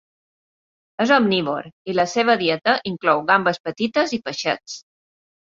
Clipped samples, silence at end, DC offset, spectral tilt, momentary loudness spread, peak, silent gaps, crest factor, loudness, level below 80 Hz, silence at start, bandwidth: under 0.1%; 0.8 s; under 0.1%; -4.5 dB/octave; 11 LU; -2 dBFS; 1.73-1.85 s, 3.60-3.64 s; 20 dB; -20 LUFS; -64 dBFS; 1 s; 7.8 kHz